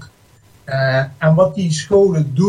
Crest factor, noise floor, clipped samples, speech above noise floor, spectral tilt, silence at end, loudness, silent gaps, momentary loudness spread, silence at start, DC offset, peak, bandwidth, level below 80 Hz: 14 dB; -49 dBFS; under 0.1%; 35 dB; -6.5 dB/octave; 0 s; -15 LUFS; none; 6 LU; 0 s; under 0.1%; -2 dBFS; 11 kHz; -50 dBFS